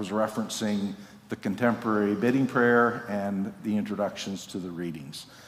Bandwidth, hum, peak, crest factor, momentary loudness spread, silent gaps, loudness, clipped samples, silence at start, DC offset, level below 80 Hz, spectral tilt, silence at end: 15.5 kHz; none; -8 dBFS; 20 dB; 13 LU; none; -28 LUFS; under 0.1%; 0 s; under 0.1%; -68 dBFS; -5.5 dB/octave; 0 s